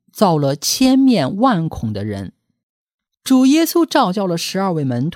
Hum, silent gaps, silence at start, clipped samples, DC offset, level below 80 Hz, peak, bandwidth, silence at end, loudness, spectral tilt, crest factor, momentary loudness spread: none; 2.63-2.87 s, 2.94-2.99 s; 0.15 s; under 0.1%; under 0.1%; -48 dBFS; 0 dBFS; 17 kHz; 0 s; -16 LUFS; -5 dB/octave; 16 dB; 12 LU